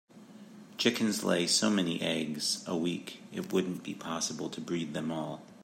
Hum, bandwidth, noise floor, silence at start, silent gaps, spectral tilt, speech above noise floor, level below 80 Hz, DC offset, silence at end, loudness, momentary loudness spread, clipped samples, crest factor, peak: none; 16 kHz; -52 dBFS; 0.15 s; none; -3.5 dB/octave; 19 dB; -76 dBFS; under 0.1%; 0 s; -32 LUFS; 14 LU; under 0.1%; 20 dB; -12 dBFS